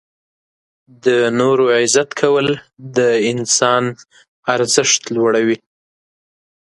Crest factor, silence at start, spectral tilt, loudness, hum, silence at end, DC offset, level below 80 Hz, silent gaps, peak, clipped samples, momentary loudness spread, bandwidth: 16 dB; 1.05 s; -3 dB/octave; -15 LUFS; none; 1.1 s; under 0.1%; -62 dBFS; 4.28-4.43 s; 0 dBFS; under 0.1%; 8 LU; 11.5 kHz